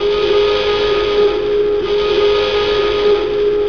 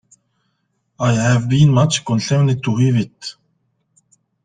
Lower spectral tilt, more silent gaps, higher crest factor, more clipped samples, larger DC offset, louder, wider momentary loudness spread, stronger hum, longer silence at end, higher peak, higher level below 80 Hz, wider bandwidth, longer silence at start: about the same, -5 dB/octave vs -6 dB/octave; neither; second, 10 dB vs 16 dB; neither; first, 1% vs under 0.1%; about the same, -14 LUFS vs -16 LUFS; second, 2 LU vs 11 LU; neither; second, 0 s vs 1.15 s; about the same, -4 dBFS vs -2 dBFS; first, -36 dBFS vs -50 dBFS; second, 5.4 kHz vs 9.6 kHz; second, 0 s vs 1 s